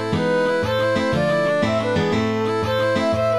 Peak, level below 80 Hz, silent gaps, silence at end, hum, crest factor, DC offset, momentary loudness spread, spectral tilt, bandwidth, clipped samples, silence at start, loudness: -8 dBFS; -46 dBFS; none; 0 s; none; 12 dB; 0.4%; 2 LU; -6 dB/octave; 13.5 kHz; under 0.1%; 0 s; -20 LUFS